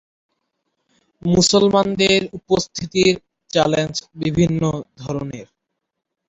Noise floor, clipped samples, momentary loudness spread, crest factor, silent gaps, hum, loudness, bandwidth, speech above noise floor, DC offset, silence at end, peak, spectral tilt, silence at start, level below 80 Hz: -79 dBFS; under 0.1%; 13 LU; 18 dB; none; none; -18 LUFS; 8 kHz; 61 dB; under 0.1%; 0.85 s; -2 dBFS; -4.5 dB/octave; 1.25 s; -48 dBFS